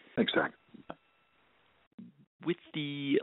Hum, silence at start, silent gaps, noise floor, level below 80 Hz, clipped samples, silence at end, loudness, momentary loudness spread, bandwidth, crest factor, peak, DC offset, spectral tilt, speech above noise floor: none; 0.15 s; 1.87-1.98 s, 2.27-2.39 s; -70 dBFS; -76 dBFS; under 0.1%; 0 s; -34 LUFS; 24 LU; 4 kHz; 22 dB; -14 dBFS; under 0.1%; -3.5 dB/octave; 38 dB